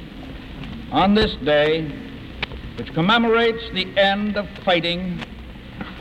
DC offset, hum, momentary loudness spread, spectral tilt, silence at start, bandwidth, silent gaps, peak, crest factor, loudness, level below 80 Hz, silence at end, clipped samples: under 0.1%; none; 18 LU; -6.5 dB/octave; 0 s; 9 kHz; none; -6 dBFS; 16 dB; -20 LUFS; -40 dBFS; 0 s; under 0.1%